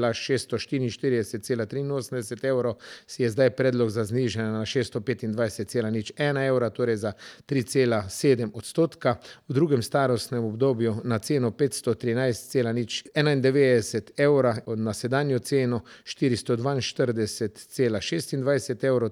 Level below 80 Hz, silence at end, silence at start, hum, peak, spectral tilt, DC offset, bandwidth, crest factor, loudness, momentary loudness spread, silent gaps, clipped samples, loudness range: -64 dBFS; 0 s; 0 s; none; -6 dBFS; -6 dB/octave; under 0.1%; 15.5 kHz; 18 dB; -26 LUFS; 7 LU; none; under 0.1%; 3 LU